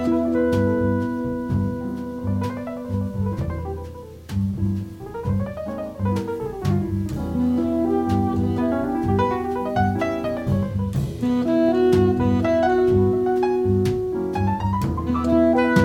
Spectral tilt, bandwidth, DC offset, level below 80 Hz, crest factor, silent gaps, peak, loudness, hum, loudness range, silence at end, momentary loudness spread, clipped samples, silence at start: -8.5 dB/octave; 15.5 kHz; under 0.1%; -40 dBFS; 16 dB; none; -4 dBFS; -22 LUFS; none; 8 LU; 0 s; 10 LU; under 0.1%; 0 s